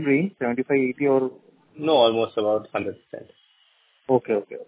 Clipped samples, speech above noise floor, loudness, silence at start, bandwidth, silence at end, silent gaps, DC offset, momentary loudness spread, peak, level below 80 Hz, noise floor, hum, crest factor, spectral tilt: under 0.1%; 39 dB; -23 LUFS; 0 s; 4 kHz; 0.05 s; none; under 0.1%; 18 LU; -6 dBFS; -66 dBFS; -62 dBFS; none; 18 dB; -10 dB/octave